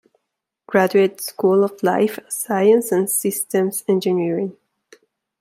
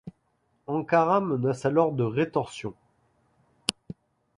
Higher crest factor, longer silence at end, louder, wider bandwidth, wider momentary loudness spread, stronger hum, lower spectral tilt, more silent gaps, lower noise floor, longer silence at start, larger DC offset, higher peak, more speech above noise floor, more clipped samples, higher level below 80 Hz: second, 18 dB vs 26 dB; first, 0.9 s vs 0.65 s; first, -19 LUFS vs -26 LUFS; first, 16 kHz vs 11.5 kHz; second, 7 LU vs 23 LU; neither; about the same, -5 dB/octave vs -6 dB/octave; neither; first, -79 dBFS vs -71 dBFS; first, 0.7 s vs 0.05 s; neither; about the same, -2 dBFS vs -2 dBFS; first, 61 dB vs 46 dB; neither; second, -70 dBFS vs -64 dBFS